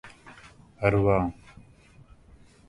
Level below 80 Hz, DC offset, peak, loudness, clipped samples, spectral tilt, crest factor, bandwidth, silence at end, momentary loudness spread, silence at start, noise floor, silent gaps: -46 dBFS; under 0.1%; -6 dBFS; -25 LUFS; under 0.1%; -8.5 dB/octave; 22 dB; 11 kHz; 1.35 s; 26 LU; 0.05 s; -54 dBFS; none